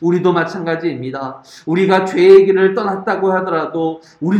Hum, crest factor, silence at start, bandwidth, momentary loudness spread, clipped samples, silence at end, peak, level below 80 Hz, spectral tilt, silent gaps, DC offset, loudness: none; 14 dB; 0 s; 8.4 kHz; 16 LU; 0.2%; 0 s; 0 dBFS; -62 dBFS; -7.5 dB/octave; none; under 0.1%; -14 LUFS